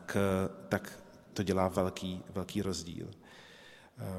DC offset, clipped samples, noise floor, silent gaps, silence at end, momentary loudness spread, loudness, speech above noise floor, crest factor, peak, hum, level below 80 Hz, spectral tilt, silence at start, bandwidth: under 0.1%; under 0.1%; -56 dBFS; none; 0 s; 22 LU; -35 LUFS; 22 dB; 22 dB; -14 dBFS; none; -62 dBFS; -5.5 dB/octave; 0 s; 15.5 kHz